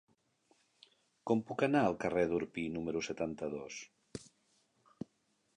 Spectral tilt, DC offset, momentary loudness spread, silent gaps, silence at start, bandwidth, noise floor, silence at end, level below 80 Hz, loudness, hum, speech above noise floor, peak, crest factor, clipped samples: -6 dB/octave; under 0.1%; 19 LU; none; 1.25 s; 10.5 kHz; -77 dBFS; 1.35 s; -66 dBFS; -35 LUFS; none; 42 dB; -16 dBFS; 22 dB; under 0.1%